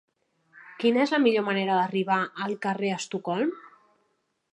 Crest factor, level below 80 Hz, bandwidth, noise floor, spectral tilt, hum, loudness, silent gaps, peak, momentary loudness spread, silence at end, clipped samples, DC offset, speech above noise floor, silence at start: 18 dB; -82 dBFS; 11 kHz; -74 dBFS; -5 dB/octave; none; -26 LUFS; none; -10 dBFS; 8 LU; 0.85 s; under 0.1%; under 0.1%; 49 dB; 0.55 s